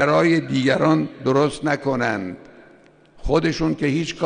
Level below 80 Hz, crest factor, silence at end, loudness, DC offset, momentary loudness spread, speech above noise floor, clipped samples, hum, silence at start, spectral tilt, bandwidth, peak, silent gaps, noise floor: -42 dBFS; 16 dB; 0 s; -20 LUFS; under 0.1%; 9 LU; 31 dB; under 0.1%; none; 0 s; -6 dB/octave; 10 kHz; -4 dBFS; none; -51 dBFS